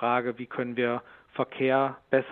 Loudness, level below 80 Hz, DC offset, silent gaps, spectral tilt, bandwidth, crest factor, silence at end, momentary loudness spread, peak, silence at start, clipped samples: -28 LUFS; -72 dBFS; under 0.1%; none; -9.5 dB/octave; 4.3 kHz; 20 dB; 0 s; 9 LU; -8 dBFS; 0 s; under 0.1%